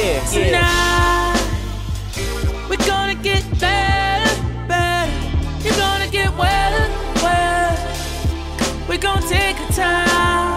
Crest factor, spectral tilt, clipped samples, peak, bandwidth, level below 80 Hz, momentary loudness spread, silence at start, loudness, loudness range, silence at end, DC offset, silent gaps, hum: 16 dB; -4 dB/octave; under 0.1%; 0 dBFS; 16 kHz; -24 dBFS; 8 LU; 0 s; -18 LUFS; 1 LU; 0 s; under 0.1%; none; none